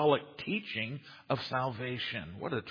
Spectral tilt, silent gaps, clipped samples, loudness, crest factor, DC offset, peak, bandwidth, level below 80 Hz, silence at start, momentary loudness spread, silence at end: -7 dB/octave; none; under 0.1%; -35 LUFS; 22 dB; under 0.1%; -14 dBFS; 5.2 kHz; -68 dBFS; 0 s; 6 LU; 0 s